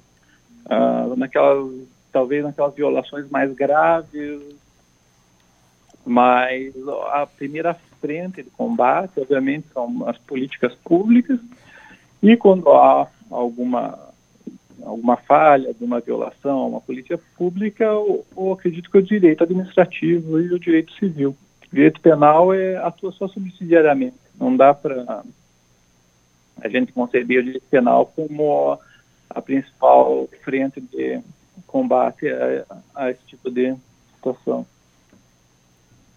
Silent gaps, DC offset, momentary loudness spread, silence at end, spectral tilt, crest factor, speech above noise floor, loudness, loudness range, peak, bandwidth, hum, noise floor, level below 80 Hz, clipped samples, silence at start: none; under 0.1%; 15 LU; 1.5 s; -8 dB/octave; 18 dB; 40 dB; -18 LUFS; 6 LU; 0 dBFS; 6.8 kHz; none; -58 dBFS; -64 dBFS; under 0.1%; 0.7 s